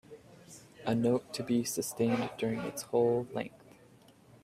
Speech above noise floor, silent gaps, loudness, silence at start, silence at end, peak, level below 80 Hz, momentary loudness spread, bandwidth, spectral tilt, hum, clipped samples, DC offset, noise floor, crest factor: 28 dB; none; -32 LUFS; 0.1 s; 0.85 s; -16 dBFS; -70 dBFS; 21 LU; 16 kHz; -5.5 dB/octave; none; under 0.1%; under 0.1%; -60 dBFS; 18 dB